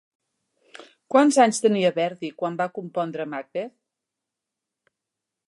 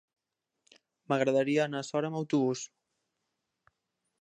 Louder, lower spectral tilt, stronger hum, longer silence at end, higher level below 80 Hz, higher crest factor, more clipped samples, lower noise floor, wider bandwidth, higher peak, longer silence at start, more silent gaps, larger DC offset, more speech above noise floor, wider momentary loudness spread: first, -23 LUFS vs -30 LUFS; about the same, -4.5 dB/octave vs -5.5 dB/octave; neither; first, 1.8 s vs 1.55 s; about the same, -78 dBFS vs -82 dBFS; about the same, 20 dB vs 20 dB; neither; about the same, -85 dBFS vs -84 dBFS; first, 11.5 kHz vs 10 kHz; first, -6 dBFS vs -12 dBFS; second, 0.8 s vs 1.1 s; neither; neither; first, 63 dB vs 54 dB; first, 14 LU vs 7 LU